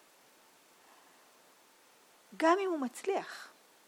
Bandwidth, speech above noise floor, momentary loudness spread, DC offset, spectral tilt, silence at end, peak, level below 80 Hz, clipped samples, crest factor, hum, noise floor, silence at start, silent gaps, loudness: 18 kHz; 31 dB; 19 LU; under 0.1%; -3 dB/octave; 0.4 s; -16 dBFS; under -90 dBFS; under 0.1%; 22 dB; none; -63 dBFS; 2.3 s; none; -33 LUFS